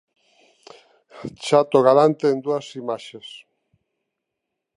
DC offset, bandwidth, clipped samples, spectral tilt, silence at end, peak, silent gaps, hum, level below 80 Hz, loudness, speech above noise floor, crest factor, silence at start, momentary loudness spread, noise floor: under 0.1%; 11 kHz; under 0.1%; -6 dB/octave; 1.4 s; -2 dBFS; none; none; -68 dBFS; -19 LUFS; 62 dB; 20 dB; 1.15 s; 22 LU; -81 dBFS